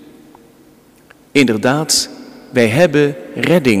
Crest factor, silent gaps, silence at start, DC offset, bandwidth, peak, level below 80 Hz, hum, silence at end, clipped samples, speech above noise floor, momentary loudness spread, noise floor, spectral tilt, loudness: 16 dB; none; 1.35 s; under 0.1%; 16 kHz; 0 dBFS; -52 dBFS; none; 0 s; under 0.1%; 34 dB; 8 LU; -47 dBFS; -4.5 dB/octave; -14 LUFS